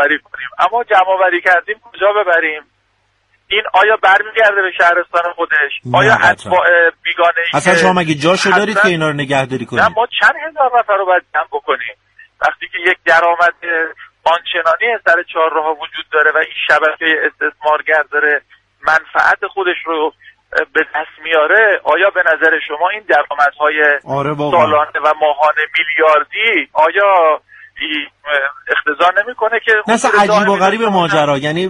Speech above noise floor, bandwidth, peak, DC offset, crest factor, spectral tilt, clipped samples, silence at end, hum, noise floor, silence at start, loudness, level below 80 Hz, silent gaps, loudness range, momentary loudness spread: 47 dB; 11.5 kHz; 0 dBFS; under 0.1%; 14 dB; -4 dB/octave; under 0.1%; 0 s; none; -60 dBFS; 0 s; -13 LUFS; -54 dBFS; none; 3 LU; 8 LU